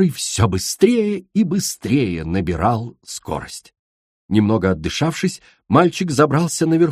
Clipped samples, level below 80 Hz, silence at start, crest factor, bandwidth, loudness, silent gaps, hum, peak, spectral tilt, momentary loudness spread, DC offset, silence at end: under 0.1%; -42 dBFS; 0 s; 18 dB; 15.5 kHz; -18 LUFS; 3.79-4.29 s; none; 0 dBFS; -5.5 dB/octave; 12 LU; under 0.1%; 0 s